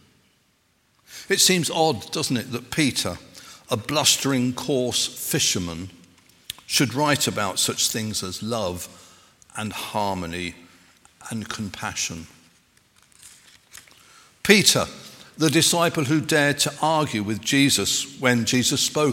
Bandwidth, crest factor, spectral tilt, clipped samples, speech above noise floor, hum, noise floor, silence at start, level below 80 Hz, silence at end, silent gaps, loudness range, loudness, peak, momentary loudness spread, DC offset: 17 kHz; 24 dB; -3 dB/octave; under 0.1%; 42 dB; none; -65 dBFS; 1.1 s; -58 dBFS; 0 s; none; 11 LU; -21 LUFS; 0 dBFS; 17 LU; under 0.1%